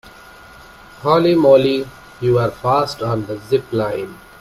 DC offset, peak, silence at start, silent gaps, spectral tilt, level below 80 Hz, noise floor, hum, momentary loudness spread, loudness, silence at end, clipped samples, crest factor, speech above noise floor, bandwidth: under 0.1%; 0 dBFS; 0.05 s; none; -7 dB/octave; -48 dBFS; -41 dBFS; none; 12 LU; -17 LUFS; 0.25 s; under 0.1%; 18 dB; 25 dB; 15 kHz